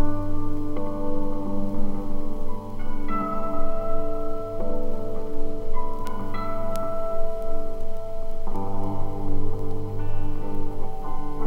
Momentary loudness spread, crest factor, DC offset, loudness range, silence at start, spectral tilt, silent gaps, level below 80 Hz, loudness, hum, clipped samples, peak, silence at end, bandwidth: 6 LU; 12 dB; under 0.1%; 2 LU; 0 s; -8.5 dB/octave; none; -26 dBFS; -32 LUFS; none; under 0.1%; -8 dBFS; 0 s; 2.3 kHz